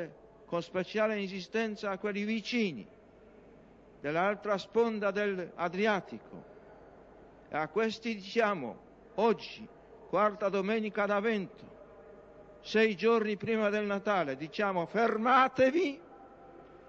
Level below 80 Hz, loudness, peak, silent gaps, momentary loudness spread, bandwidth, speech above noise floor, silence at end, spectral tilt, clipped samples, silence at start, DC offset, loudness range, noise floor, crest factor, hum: -68 dBFS; -31 LUFS; -12 dBFS; none; 16 LU; 7.6 kHz; 26 dB; 0.1 s; -6 dB/octave; under 0.1%; 0 s; under 0.1%; 5 LU; -57 dBFS; 20 dB; none